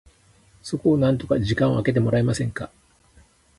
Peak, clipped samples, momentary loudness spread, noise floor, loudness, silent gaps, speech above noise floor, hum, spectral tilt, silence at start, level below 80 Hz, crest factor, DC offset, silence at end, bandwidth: -8 dBFS; under 0.1%; 14 LU; -56 dBFS; -22 LUFS; none; 35 dB; none; -7 dB/octave; 0.65 s; -46 dBFS; 16 dB; under 0.1%; 0.9 s; 11.5 kHz